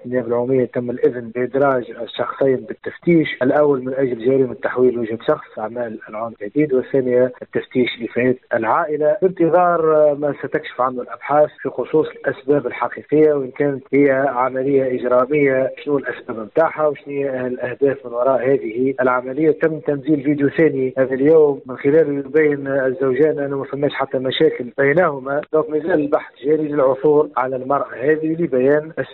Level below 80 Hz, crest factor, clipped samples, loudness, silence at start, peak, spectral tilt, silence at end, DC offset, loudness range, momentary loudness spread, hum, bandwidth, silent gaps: -60 dBFS; 14 dB; under 0.1%; -18 LUFS; 0.05 s; -4 dBFS; -5.5 dB/octave; 0 s; under 0.1%; 3 LU; 8 LU; none; 4.3 kHz; none